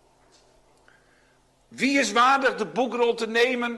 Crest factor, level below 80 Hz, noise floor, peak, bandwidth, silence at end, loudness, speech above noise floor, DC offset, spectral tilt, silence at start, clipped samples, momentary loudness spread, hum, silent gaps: 16 dB; -66 dBFS; -62 dBFS; -10 dBFS; 12 kHz; 0 s; -22 LUFS; 39 dB; under 0.1%; -3 dB/octave; 1.7 s; under 0.1%; 8 LU; none; none